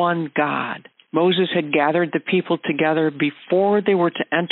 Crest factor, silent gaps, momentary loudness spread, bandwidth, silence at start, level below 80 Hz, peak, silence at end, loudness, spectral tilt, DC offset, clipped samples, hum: 14 dB; none; 6 LU; 4.2 kHz; 0 s; -72 dBFS; -6 dBFS; 0.05 s; -20 LUFS; -4 dB/octave; under 0.1%; under 0.1%; none